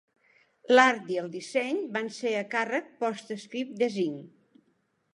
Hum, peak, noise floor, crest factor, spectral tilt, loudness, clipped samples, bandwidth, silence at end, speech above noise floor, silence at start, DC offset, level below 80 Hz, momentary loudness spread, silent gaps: none; -4 dBFS; -72 dBFS; 24 dB; -4 dB/octave; -28 LUFS; under 0.1%; 11 kHz; 0.85 s; 45 dB; 0.7 s; under 0.1%; -86 dBFS; 15 LU; none